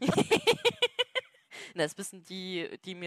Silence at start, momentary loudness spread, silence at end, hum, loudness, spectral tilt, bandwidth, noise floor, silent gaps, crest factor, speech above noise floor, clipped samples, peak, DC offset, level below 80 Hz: 0 s; 16 LU; 0 s; none; -30 LUFS; -3.5 dB/octave; 15 kHz; -49 dBFS; none; 16 dB; 13 dB; under 0.1%; -14 dBFS; under 0.1%; -66 dBFS